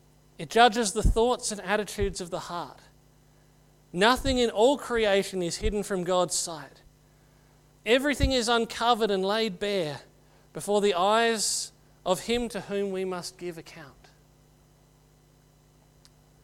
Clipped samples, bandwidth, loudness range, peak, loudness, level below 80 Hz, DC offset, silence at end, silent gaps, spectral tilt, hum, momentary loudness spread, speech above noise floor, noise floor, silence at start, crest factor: under 0.1%; 16.5 kHz; 7 LU; -4 dBFS; -26 LUFS; -40 dBFS; under 0.1%; 2.55 s; none; -3.5 dB/octave; 50 Hz at -55 dBFS; 15 LU; 33 dB; -59 dBFS; 0.4 s; 24 dB